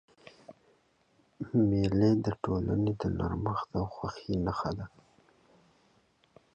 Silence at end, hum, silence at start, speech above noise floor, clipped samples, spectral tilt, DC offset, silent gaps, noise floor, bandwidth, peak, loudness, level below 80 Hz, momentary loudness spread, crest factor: 1.65 s; none; 0.5 s; 39 dB; under 0.1%; -8.5 dB/octave; under 0.1%; none; -69 dBFS; 8.2 kHz; -16 dBFS; -31 LUFS; -50 dBFS; 13 LU; 18 dB